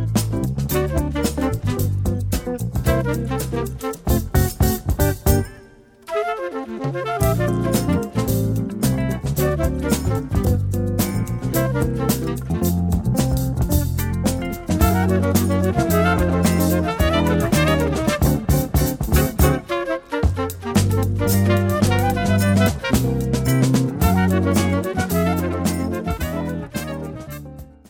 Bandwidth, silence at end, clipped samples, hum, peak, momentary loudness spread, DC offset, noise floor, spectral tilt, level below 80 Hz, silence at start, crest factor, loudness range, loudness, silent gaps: 17.5 kHz; 0.2 s; under 0.1%; none; -2 dBFS; 7 LU; under 0.1%; -46 dBFS; -6 dB/octave; -28 dBFS; 0 s; 16 dB; 4 LU; -20 LUFS; none